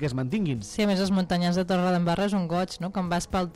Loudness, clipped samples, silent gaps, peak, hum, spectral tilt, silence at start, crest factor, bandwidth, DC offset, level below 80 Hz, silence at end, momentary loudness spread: -26 LUFS; under 0.1%; none; -14 dBFS; none; -6 dB/octave; 0 s; 12 dB; 14 kHz; under 0.1%; -48 dBFS; 0.05 s; 5 LU